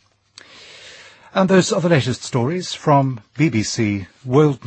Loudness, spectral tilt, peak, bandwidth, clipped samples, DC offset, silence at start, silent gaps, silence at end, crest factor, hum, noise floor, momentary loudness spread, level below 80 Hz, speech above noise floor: -18 LUFS; -5.5 dB/octave; -2 dBFS; 8.8 kHz; under 0.1%; under 0.1%; 0.8 s; none; 0.1 s; 16 dB; none; -48 dBFS; 16 LU; -56 dBFS; 30 dB